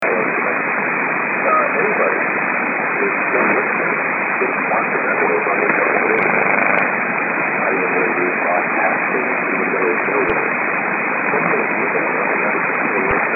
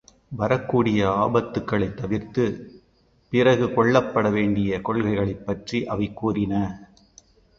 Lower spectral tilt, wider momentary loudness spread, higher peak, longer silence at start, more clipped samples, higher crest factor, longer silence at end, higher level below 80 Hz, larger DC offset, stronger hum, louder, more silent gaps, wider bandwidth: first, -9 dB/octave vs -7.5 dB/octave; second, 3 LU vs 9 LU; about the same, 0 dBFS vs -2 dBFS; second, 0 s vs 0.3 s; neither; about the same, 16 dB vs 20 dB; second, 0 s vs 0.75 s; second, -54 dBFS vs -48 dBFS; neither; neither; first, -16 LUFS vs -23 LUFS; neither; second, 4.5 kHz vs 7.4 kHz